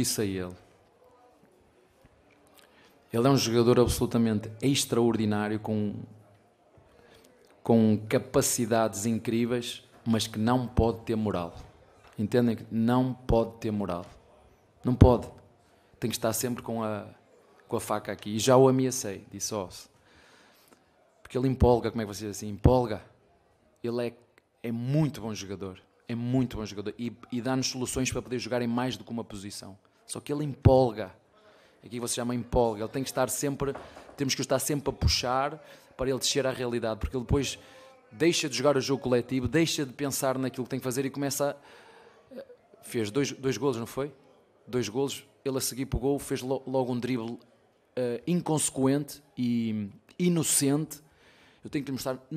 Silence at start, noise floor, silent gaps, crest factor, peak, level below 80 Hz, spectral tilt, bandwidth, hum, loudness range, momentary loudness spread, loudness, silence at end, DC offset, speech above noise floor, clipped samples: 0 s; -65 dBFS; none; 26 dB; -4 dBFS; -44 dBFS; -5 dB/octave; 15.5 kHz; none; 5 LU; 15 LU; -28 LUFS; 0 s; under 0.1%; 37 dB; under 0.1%